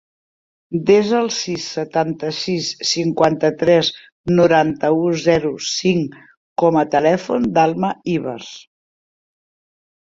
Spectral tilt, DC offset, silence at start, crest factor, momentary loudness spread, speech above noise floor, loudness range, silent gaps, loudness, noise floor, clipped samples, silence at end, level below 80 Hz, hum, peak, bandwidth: -5 dB/octave; under 0.1%; 0.7 s; 16 dB; 9 LU; over 73 dB; 3 LU; 4.12-4.24 s, 6.37-6.56 s; -17 LUFS; under -90 dBFS; under 0.1%; 1.45 s; -54 dBFS; none; -2 dBFS; 7.8 kHz